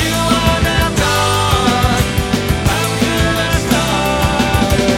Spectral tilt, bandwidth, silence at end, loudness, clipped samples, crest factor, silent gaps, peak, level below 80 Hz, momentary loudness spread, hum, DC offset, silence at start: -4.5 dB/octave; 17 kHz; 0 s; -14 LUFS; under 0.1%; 14 dB; none; 0 dBFS; -24 dBFS; 2 LU; none; under 0.1%; 0 s